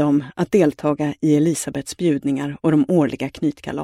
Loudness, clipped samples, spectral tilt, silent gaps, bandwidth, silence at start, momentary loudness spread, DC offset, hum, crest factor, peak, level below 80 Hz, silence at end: -20 LUFS; under 0.1%; -6.5 dB/octave; none; 14 kHz; 0 s; 7 LU; under 0.1%; none; 16 dB; -4 dBFS; -54 dBFS; 0 s